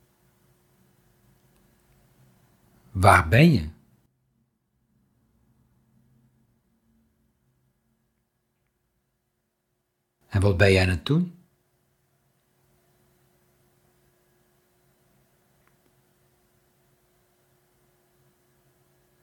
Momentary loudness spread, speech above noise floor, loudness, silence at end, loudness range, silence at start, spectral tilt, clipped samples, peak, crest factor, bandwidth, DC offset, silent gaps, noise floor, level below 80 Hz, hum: 16 LU; 58 dB; -20 LUFS; 7.9 s; 10 LU; 2.95 s; -6.5 dB/octave; under 0.1%; -2 dBFS; 28 dB; 15 kHz; under 0.1%; none; -77 dBFS; -50 dBFS; none